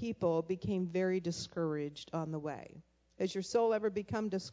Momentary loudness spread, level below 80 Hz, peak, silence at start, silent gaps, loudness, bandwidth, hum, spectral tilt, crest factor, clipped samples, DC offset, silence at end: 9 LU; -66 dBFS; -20 dBFS; 0 s; none; -36 LUFS; 8 kHz; none; -6 dB/octave; 16 dB; under 0.1%; under 0.1%; 0 s